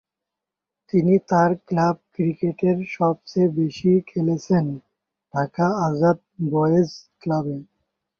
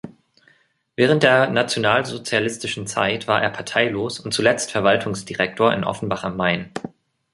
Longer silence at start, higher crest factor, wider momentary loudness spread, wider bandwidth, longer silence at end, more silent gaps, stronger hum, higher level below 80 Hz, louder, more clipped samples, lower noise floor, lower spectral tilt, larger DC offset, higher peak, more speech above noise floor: first, 0.95 s vs 0.05 s; about the same, 16 dB vs 20 dB; about the same, 8 LU vs 10 LU; second, 7 kHz vs 11.5 kHz; about the same, 0.55 s vs 0.45 s; neither; neither; about the same, -60 dBFS vs -56 dBFS; about the same, -22 LUFS vs -20 LUFS; neither; first, -86 dBFS vs -60 dBFS; first, -8.5 dB/octave vs -4 dB/octave; neither; second, -6 dBFS vs 0 dBFS; first, 65 dB vs 40 dB